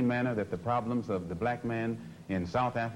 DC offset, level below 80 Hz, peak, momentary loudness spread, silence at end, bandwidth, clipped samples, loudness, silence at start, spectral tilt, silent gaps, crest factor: under 0.1%; -58 dBFS; -18 dBFS; 6 LU; 0 s; 11.5 kHz; under 0.1%; -33 LUFS; 0 s; -8 dB/octave; none; 14 dB